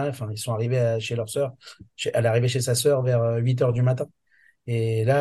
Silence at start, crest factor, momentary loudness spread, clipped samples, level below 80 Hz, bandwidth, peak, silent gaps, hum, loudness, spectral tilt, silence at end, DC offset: 0 s; 16 dB; 9 LU; under 0.1%; -60 dBFS; 12.5 kHz; -8 dBFS; none; none; -24 LUFS; -5.5 dB/octave; 0 s; under 0.1%